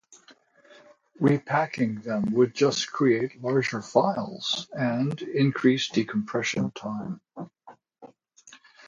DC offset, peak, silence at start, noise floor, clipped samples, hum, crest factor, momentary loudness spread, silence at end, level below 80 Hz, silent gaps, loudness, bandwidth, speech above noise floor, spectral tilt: under 0.1%; -6 dBFS; 0.1 s; -57 dBFS; under 0.1%; none; 22 dB; 11 LU; 0.3 s; -68 dBFS; none; -26 LUFS; 7.8 kHz; 32 dB; -5.5 dB/octave